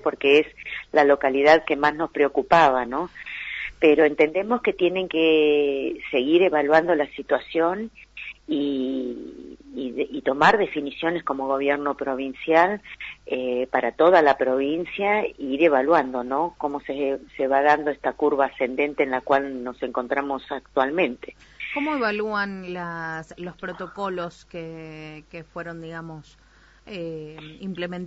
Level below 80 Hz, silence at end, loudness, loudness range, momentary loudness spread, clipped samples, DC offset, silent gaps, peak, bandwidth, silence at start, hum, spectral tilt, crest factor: -56 dBFS; 0 s; -22 LUFS; 13 LU; 18 LU; under 0.1%; under 0.1%; none; -4 dBFS; 8 kHz; 0 s; none; -6 dB/octave; 18 dB